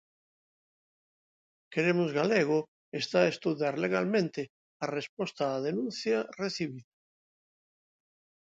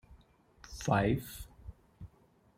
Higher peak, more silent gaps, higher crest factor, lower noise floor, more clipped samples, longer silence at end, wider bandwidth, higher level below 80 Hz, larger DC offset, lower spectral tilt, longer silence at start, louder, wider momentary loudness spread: about the same, -12 dBFS vs -14 dBFS; first, 2.68-2.92 s, 4.49-4.80 s, 5.09-5.17 s vs none; about the same, 22 dB vs 24 dB; first, under -90 dBFS vs -66 dBFS; neither; first, 1.65 s vs 0.5 s; second, 8 kHz vs 16 kHz; second, -78 dBFS vs -52 dBFS; neither; about the same, -5.5 dB/octave vs -6 dB/octave; first, 1.7 s vs 0.1 s; about the same, -31 LUFS vs -32 LUFS; second, 11 LU vs 25 LU